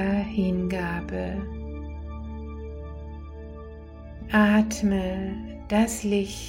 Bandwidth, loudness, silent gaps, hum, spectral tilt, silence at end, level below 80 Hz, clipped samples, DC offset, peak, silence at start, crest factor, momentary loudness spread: 16.5 kHz; -26 LUFS; none; none; -6 dB/octave; 0 s; -38 dBFS; under 0.1%; under 0.1%; -8 dBFS; 0 s; 18 dB; 19 LU